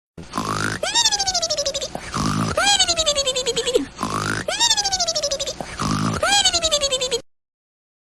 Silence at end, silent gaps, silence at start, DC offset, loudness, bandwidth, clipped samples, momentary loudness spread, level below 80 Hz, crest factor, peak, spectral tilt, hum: 0.8 s; none; 0.15 s; under 0.1%; -19 LUFS; 15.5 kHz; under 0.1%; 11 LU; -44 dBFS; 18 dB; -4 dBFS; -2 dB/octave; none